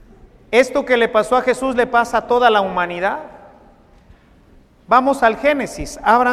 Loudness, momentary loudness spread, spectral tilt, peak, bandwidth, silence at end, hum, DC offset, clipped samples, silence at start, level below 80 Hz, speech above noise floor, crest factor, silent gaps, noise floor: -16 LUFS; 8 LU; -4 dB/octave; 0 dBFS; 14.5 kHz; 0 s; none; under 0.1%; under 0.1%; 0.5 s; -44 dBFS; 33 dB; 18 dB; none; -49 dBFS